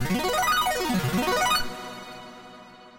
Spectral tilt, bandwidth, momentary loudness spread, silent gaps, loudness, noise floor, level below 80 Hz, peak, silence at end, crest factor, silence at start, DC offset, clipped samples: -3.5 dB/octave; 17 kHz; 21 LU; none; -24 LUFS; -47 dBFS; -46 dBFS; -10 dBFS; 0 s; 16 dB; 0 s; under 0.1%; under 0.1%